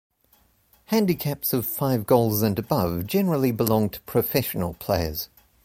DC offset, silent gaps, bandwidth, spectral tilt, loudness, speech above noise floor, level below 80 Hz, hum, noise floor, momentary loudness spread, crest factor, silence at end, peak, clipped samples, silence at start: under 0.1%; none; 16.5 kHz; -6 dB/octave; -24 LUFS; 39 dB; -46 dBFS; none; -62 dBFS; 6 LU; 20 dB; 0.4 s; -4 dBFS; under 0.1%; 0.9 s